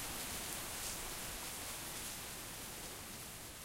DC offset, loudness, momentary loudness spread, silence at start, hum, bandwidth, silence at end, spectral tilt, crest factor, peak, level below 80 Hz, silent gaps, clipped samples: under 0.1%; -43 LUFS; 5 LU; 0 s; none; 16 kHz; 0 s; -1.5 dB/octave; 22 dB; -24 dBFS; -58 dBFS; none; under 0.1%